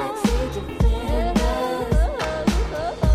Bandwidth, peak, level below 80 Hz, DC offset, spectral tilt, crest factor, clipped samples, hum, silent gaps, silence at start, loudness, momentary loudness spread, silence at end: 14 kHz; -6 dBFS; -24 dBFS; under 0.1%; -6 dB/octave; 14 dB; under 0.1%; none; none; 0 s; -23 LUFS; 3 LU; 0 s